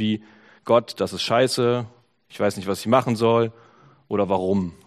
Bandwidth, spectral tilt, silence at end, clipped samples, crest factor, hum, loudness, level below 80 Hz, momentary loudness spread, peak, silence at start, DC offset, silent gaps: 15 kHz; -5.5 dB/octave; 0.15 s; under 0.1%; 20 dB; none; -22 LUFS; -62 dBFS; 8 LU; -4 dBFS; 0 s; under 0.1%; none